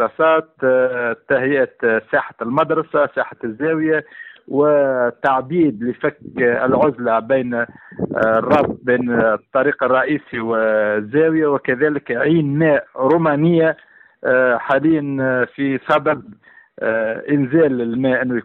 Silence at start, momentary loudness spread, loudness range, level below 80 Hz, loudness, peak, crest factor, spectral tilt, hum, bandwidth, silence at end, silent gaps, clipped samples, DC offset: 0 s; 7 LU; 2 LU; -56 dBFS; -17 LUFS; -4 dBFS; 14 dB; -9 dB/octave; none; 4.4 kHz; 0.05 s; none; under 0.1%; under 0.1%